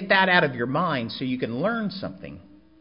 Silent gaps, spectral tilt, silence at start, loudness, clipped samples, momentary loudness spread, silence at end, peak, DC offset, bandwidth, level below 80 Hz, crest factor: none; -10 dB/octave; 0 s; -23 LUFS; under 0.1%; 18 LU; 0.4 s; -4 dBFS; 0.1%; 5.4 kHz; -58 dBFS; 20 dB